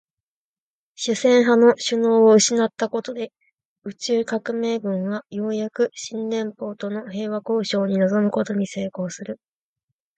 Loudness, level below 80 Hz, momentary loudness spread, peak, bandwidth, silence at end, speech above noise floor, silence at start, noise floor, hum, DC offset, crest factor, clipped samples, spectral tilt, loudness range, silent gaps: -21 LUFS; -70 dBFS; 15 LU; -4 dBFS; 9.2 kHz; 0.8 s; over 69 dB; 1 s; under -90 dBFS; none; under 0.1%; 16 dB; under 0.1%; -4.5 dB/octave; 7 LU; 3.53-3.58 s, 3.65-3.76 s